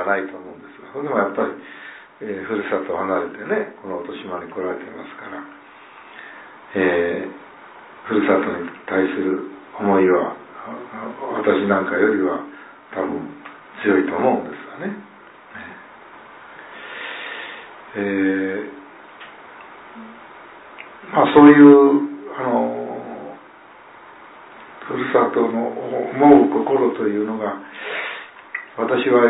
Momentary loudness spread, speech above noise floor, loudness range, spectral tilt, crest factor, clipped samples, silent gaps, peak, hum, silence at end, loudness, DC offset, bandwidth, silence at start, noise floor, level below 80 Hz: 23 LU; 27 dB; 13 LU; -10.5 dB/octave; 20 dB; under 0.1%; none; 0 dBFS; none; 0 s; -19 LUFS; under 0.1%; 4 kHz; 0 s; -44 dBFS; -62 dBFS